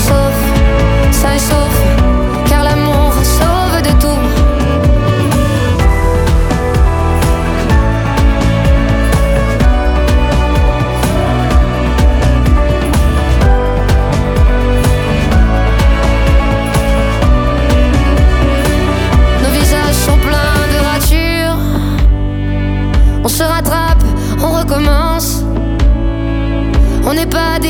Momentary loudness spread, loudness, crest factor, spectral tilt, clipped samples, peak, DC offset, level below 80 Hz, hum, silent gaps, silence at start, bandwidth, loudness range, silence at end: 3 LU; -12 LUFS; 10 dB; -5.5 dB/octave; under 0.1%; 0 dBFS; under 0.1%; -12 dBFS; none; none; 0 s; 18.5 kHz; 2 LU; 0 s